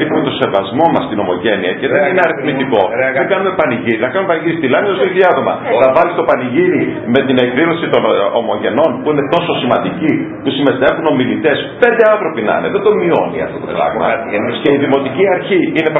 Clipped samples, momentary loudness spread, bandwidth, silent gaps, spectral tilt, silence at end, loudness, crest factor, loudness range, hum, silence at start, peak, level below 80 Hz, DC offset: under 0.1%; 4 LU; 5 kHz; none; -8.5 dB/octave; 0 s; -13 LUFS; 12 dB; 2 LU; none; 0 s; 0 dBFS; -50 dBFS; under 0.1%